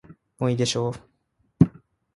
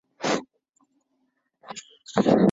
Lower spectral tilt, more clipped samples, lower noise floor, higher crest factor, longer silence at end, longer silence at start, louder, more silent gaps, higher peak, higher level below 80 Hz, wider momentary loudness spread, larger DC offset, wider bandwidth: about the same, -6 dB/octave vs -6 dB/octave; neither; second, -69 dBFS vs -73 dBFS; about the same, 24 dB vs 20 dB; first, 0.45 s vs 0 s; about the same, 0.1 s vs 0.2 s; about the same, -24 LUFS vs -24 LUFS; second, none vs 0.69-0.73 s; first, -2 dBFS vs -6 dBFS; first, -50 dBFS vs -62 dBFS; second, 8 LU vs 20 LU; neither; first, 11.5 kHz vs 8 kHz